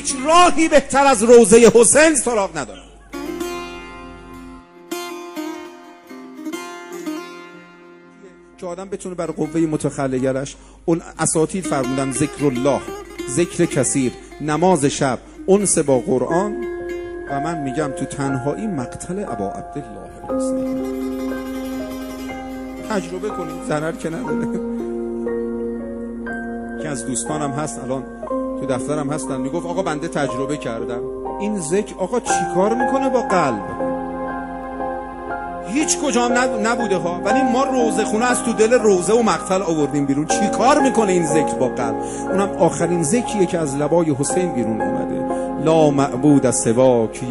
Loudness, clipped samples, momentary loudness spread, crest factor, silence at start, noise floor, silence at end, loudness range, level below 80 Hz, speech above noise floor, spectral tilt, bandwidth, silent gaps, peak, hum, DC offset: -19 LUFS; under 0.1%; 15 LU; 20 dB; 0 s; -44 dBFS; 0 s; 11 LU; -44 dBFS; 26 dB; -4.5 dB/octave; 15 kHz; none; 0 dBFS; none; under 0.1%